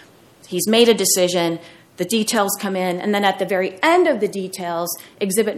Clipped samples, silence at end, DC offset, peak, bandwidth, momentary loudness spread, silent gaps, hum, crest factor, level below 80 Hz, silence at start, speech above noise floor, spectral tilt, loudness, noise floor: under 0.1%; 0 s; under 0.1%; 0 dBFS; 16.5 kHz; 11 LU; none; none; 18 dB; -68 dBFS; 0.5 s; 29 dB; -3 dB/octave; -19 LUFS; -47 dBFS